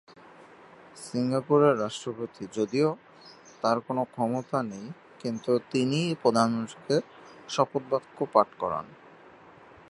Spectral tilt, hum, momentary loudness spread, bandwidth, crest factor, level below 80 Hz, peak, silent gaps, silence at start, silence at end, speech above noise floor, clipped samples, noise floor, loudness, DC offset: -6 dB/octave; none; 13 LU; 11.5 kHz; 24 dB; -70 dBFS; -6 dBFS; none; 0.95 s; 0.95 s; 25 dB; under 0.1%; -52 dBFS; -28 LUFS; under 0.1%